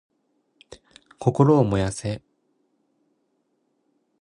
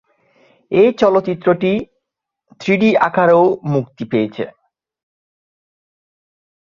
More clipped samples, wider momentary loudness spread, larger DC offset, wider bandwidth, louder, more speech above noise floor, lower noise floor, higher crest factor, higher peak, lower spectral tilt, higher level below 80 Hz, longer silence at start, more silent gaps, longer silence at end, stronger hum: neither; first, 14 LU vs 11 LU; neither; first, 10.5 kHz vs 7.2 kHz; second, -22 LUFS vs -15 LUFS; second, 51 dB vs 64 dB; second, -71 dBFS vs -78 dBFS; first, 22 dB vs 16 dB; about the same, -4 dBFS vs -2 dBFS; about the same, -7.5 dB/octave vs -7.5 dB/octave; first, -50 dBFS vs -58 dBFS; about the same, 0.7 s vs 0.7 s; neither; about the same, 2.05 s vs 2.15 s; neither